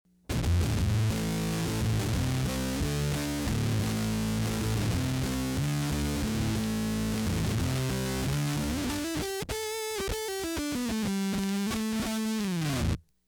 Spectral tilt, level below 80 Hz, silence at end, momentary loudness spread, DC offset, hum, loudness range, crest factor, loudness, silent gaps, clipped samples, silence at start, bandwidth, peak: -5 dB/octave; -40 dBFS; 0.25 s; 4 LU; under 0.1%; none; 2 LU; 12 dB; -30 LUFS; none; under 0.1%; 0.3 s; over 20 kHz; -18 dBFS